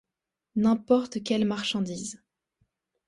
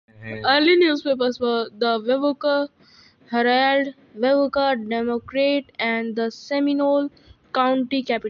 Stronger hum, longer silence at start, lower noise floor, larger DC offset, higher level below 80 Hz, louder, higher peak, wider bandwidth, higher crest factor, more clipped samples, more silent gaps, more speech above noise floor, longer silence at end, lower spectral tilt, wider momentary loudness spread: neither; first, 0.55 s vs 0.2 s; first, -87 dBFS vs -52 dBFS; neither; about the same, -64 dBFS vs -62 dBFS; second, -27 LUFS vs -21 LUFS; second, -10 dBFS vs -6 dBFS; first, 11.5 kHz vs 7 kHz; about the same, 18 dB vs 16 dB; neither; neither; first, 61 dB vs 32 dB; first, 0.9 s vs 0 s; about the same, -5 dB/octave vs -5 dB/octave; first, 11 LU vs 8 LU